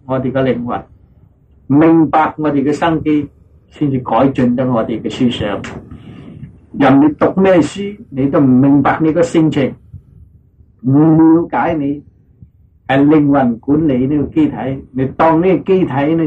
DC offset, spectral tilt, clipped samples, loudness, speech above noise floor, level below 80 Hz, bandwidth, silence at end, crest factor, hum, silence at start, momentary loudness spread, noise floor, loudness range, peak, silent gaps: under 0.1%; -8 dB/octave; under 0.1%; -13 LUFS; 35 dB; -42 dBFS; 8.8 kHz; 0 s; 10 dB; none; 0.1 s; 13 LU; -47 dBFS; 3 LU; -4 dBFS; none